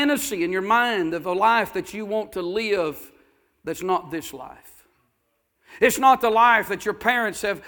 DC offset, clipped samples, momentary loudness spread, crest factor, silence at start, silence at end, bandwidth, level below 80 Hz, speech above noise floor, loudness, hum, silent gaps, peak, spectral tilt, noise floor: under 0.1%; under 0.1%; 16 LU; 20 dB; 0 s; 0 s; 19.5 kHz; -58 dBFS; 50 dB; -21 LUFS; none; none; -2 dBFS; -3.5 dB/octave; -72 dBFS